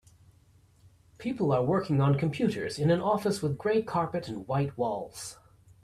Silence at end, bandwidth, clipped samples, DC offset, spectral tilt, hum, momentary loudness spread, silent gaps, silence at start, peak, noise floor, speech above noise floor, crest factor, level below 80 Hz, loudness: 0.5 s; 13.5 kHz; under 0.1%; under 0.1%; -7 dB/octave; none; 11 LU; none; 1.2 s; -14 dBFS; -61 dBFS; 33 dB; 16 dB; -60 dBFS; -29 LUFS